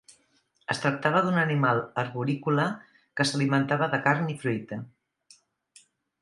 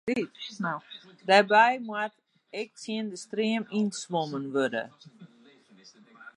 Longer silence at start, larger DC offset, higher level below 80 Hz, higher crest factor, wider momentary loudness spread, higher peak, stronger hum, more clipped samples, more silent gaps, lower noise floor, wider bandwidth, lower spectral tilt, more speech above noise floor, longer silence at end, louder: first, 0.7 s vs 0.05 s; neither; first, -70 dBFS vs -78 dBFS; about the same, 22 dB vs 22 dB; second, 13 LU vs 17 LU; about the same, -6 dBFS vs -6 dBFS; neither; neither; neither; first, -68 dBFS vs -57 dBFS; about the same, 11.5 kHz vs 11.5 kHz; first, -6 dB/octave vs -4.5 dB/octave; first, 42 dB vs 29 dB; first, 1.35 s vs 0.05 s; about the same, -26 LUFS vs -28 LUFS